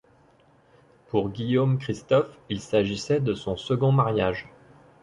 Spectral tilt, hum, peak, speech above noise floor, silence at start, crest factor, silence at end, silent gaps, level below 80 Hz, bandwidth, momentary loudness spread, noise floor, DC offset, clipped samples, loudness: -7 dB/octave; none; -8 dBFS; 35 dB; 1.15 s; 18 dB; 0.6 s; none; -54 dBFS; 10.5 kHz; 8 LU; -59 dBFS; under 0.1%; under 0.1%; -25 LUFS